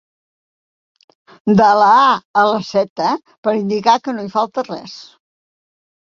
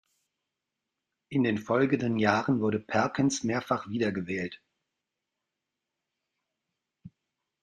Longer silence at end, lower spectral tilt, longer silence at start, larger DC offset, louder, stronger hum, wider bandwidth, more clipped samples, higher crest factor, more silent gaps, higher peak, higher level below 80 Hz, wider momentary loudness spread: first, 1.1 s vs 0.55 s; about the same, -5.5 dB/octave vs -5.5 dB/octave; first, 1.45 s vs 1.3 s; neither; first, -15 LUFS vs -28 LUFS; neither; second, 7.4 kHz vs 9.8 kHz; neither; second, 16 dB vs 22 dB; first, 2.25-2.34 s, 2.90-2.96 s, 3.38-3.43 s vs none; first, -2 dBFS vs -8 dBFS; first, -60 dBFS vs -68 dBFS; first, 15 LU vs 7 LU